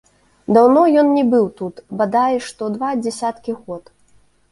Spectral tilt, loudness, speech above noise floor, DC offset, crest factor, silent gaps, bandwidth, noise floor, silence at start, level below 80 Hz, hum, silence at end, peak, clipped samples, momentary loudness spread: -6 dB/octave; -16 LUFS; 37 dB; under 0.1%; 16 dB; none; 11.5 kHz; -54 dBFS; 0.5 s; -58 dBFS; none; 0.7 s; -2 dBFS; under 0.1%; 17 LU